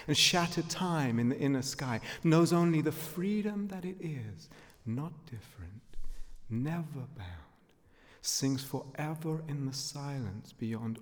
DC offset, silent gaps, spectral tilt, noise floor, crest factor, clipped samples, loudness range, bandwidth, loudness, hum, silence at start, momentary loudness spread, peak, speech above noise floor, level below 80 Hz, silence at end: under 0.1%; none; -4.5 dB/octave; -64 dBFS; 20 dB; under 0.1%; 11 LU; over 20 kHz; -33 LUFS; none; 0 s; 21 LU; -12 dBFS; 30 dB; -54 dBFS; 0 s